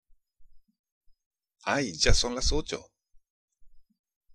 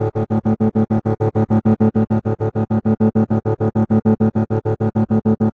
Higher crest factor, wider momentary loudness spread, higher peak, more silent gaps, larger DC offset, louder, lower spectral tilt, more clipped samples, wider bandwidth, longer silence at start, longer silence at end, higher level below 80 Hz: first, 22 dB vs 14 dB; first, 13 LU vs 4 LU; second, -8 dBFS vs -4 dBFS; first, 0.79-0.84 s, 0.92-1.01 s, 1.26-1.31 s, 3.30-3.48 s vs none; neither; second, -28 LUFS vs -18 LUFS; second, -3 dB/octave vs -11.5 dB/octave; neither; first, 10.5 kHz vs 3.8 kHz; first, 0.4 s vs 0 s; first, 0.55 s vs 0.05 s; first, -36 dBFS vs -44 dBFS